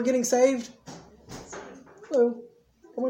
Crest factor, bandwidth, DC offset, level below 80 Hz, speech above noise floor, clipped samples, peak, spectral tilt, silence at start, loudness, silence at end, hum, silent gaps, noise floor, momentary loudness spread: 18 dB; 16.5 kHz; under 0.1%; -64 dBFS; 32 dB; under 0.1%; -8 dBFS; -4 dB/octave; 0 s; -24 LUFS; 0 s; none; none; -56 dBFS; 24 LU